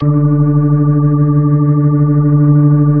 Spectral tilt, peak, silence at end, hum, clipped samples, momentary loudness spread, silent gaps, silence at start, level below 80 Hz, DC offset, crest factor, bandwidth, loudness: -17 dB/octave; 0 dBFS; 0 s; none; under 0.1%; 2 LU; none; 0 s; -40 dBFS; under 0.1%; 10 dB; 2 kHz; -11 LUFS